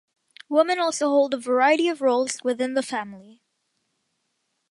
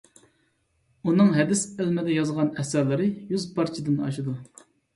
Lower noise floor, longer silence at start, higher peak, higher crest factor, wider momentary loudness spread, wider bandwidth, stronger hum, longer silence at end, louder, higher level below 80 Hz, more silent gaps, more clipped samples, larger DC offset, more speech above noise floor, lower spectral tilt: first, -75 dBFS vs -69 dBFS; second, 0.5 s vs 1.05 s; about the same, -6 dBFS vs -8 dBFS; about the same, 18 dB vs 18 dB; second, 8 LU vs 11 LU; about the same, 11.5 kHz vs 11.5 kHz; neither; first, 1.5 s vs 0.5 s; first, -22 LUFS vs -25 LUFS; second, -78 dBFS vs -64 dBFS; neither; neither; neither; first, 53 dB vs 45 dB; second, -2.5 dB/octave vs -6 dB/octave